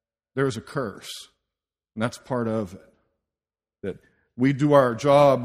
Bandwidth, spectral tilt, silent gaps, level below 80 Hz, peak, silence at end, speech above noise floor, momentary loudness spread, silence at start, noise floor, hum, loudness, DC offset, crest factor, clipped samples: 15 kHz; -6.5 dB/octave; none; -62 dBFS; -2 dBFS; 0 s; over 68 dB; 19 LU; 0.35 s; under -90 dBFS; none; -23 LUFS; under 0.1%; 22 dB; under 0.1%